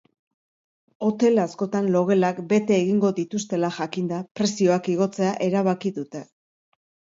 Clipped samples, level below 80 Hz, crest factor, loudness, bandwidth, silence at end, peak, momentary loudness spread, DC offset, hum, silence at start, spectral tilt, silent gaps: under 0.1%; -70 dBFS; 16 dB; -23 LUFS; 7.8 kHz; 0.95 s; -8 dBFS; 8 LU; under 0.1%; none; 1 s; -6 dB/octave; 4.31-4.35 s